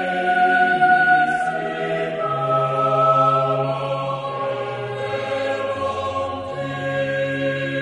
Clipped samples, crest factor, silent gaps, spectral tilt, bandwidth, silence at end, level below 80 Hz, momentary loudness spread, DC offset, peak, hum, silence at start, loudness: under 0.1%; 16 dB; none; -6 dB/octave; 10.5 kHz; 0 s; -58 dBFS; 10 LU; under 0.1%; -4 dBFS; none; 0 s; -20 LUFS